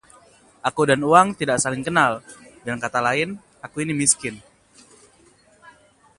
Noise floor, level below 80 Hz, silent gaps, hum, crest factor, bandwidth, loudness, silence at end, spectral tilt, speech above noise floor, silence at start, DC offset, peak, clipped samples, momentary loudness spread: -55 dBFS; -58 dBFS; none; none; 24 dB; 11.5 kHz; -20 LUFS; 0.5 s; -3.5 dB/octave; 35 dB; 0.65 s; under 0.1%; 0 dBFS; under 0.1%; 17 LU